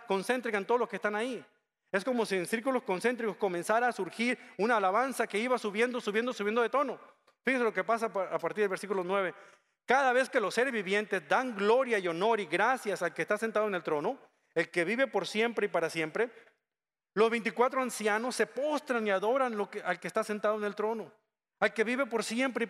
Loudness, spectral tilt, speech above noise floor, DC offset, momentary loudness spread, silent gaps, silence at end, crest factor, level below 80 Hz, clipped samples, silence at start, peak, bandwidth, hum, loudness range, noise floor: -31 LUFS; -4 dB/octave; over 59 dB; under 0.1%; 6 LU; none; 0 s; 20 dB; -84 dBFS; under 0.1%; 0 s; -10 dBFS; 14.5 kHz; none; 3 LU; under -90 dBFS